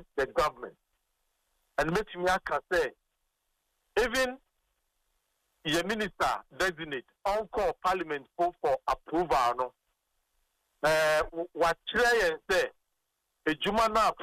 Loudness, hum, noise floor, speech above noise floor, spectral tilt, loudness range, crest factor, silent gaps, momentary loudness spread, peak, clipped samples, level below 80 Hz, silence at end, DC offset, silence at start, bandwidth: -30 LUFS; none; -81 dBFS; 52 dB; -3.5 dB/octave; 5 LU; 16 dB; none; 10 LU; -16 dBFS; under 0.1%; -54 dBFS; 0 s; under 0.1%; 0 s; 15.5 kHz